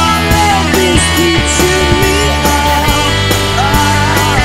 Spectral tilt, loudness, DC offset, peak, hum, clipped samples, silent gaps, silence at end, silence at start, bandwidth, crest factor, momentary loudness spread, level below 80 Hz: -4 dB/octave; -10 LUFS; 2%; 0 dBFS; none; 0.2%; none; 0 s; 0 s; 16.5 kHz; 10 dB; 2 LU; -20 dBFS